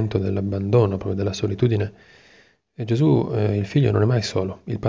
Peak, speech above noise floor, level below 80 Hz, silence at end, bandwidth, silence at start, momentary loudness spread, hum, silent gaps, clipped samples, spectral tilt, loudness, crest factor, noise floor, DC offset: -6 dBFS; 35 dB; -44 dBFS; 0 s; 7.8 kHz; 0 s; 7 LU; none; none; under 0.1%; -7.5 dB/octave; -21 LUFS; 16 dB; -55 dBFS; under 0.1%